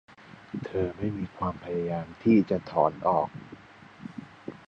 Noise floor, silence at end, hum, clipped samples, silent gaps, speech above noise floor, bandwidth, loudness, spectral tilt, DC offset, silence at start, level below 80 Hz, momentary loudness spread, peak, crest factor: -50 dBFS; 0.1 s; none; under 0.1%; none; 23 dB; 6.8 kHz; -28 LUFS; -9.5 dB/octave; under 0.1%; 0.3 s; -54 dBFS; 21 LU; -8 dBFS; 22 dB